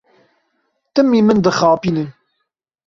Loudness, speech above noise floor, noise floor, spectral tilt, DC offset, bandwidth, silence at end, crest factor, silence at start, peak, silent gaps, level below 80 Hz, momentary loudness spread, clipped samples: -15 LUFS; 60 dB; -74 dBFS; -6.5 dB/octave; under 0.1%; 7.6 kHz; 0.75 s; 16 dB; 0.95 s; -2 dBFS; none; -52 dBFS; 10 LU; under 0.1%